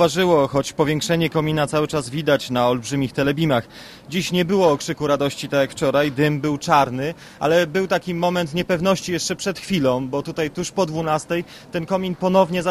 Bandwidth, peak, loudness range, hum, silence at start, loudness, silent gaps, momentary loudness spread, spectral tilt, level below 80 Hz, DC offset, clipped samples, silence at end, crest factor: 15.5 kHz; -2 dBFS; 2 LU; none; 0 s; -20 LUFS; none; 7 LU; -5 dB/octave; -50 dBFS; under 0.1%; under 0.1%; 0 s; 18 dB